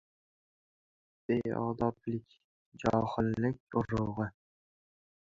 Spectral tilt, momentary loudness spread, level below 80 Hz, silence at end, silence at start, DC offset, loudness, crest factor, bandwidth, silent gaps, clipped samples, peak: -8.5 dB/octave; 8 LU; -58 dBFS; 0.95 s; 1.3 s; under 0.1%; -34 LUFS; 22 dB; 7.6 kHz; 2.44-2.72 s, 3.60-3.67 s; under 0.1%; -12 dBFS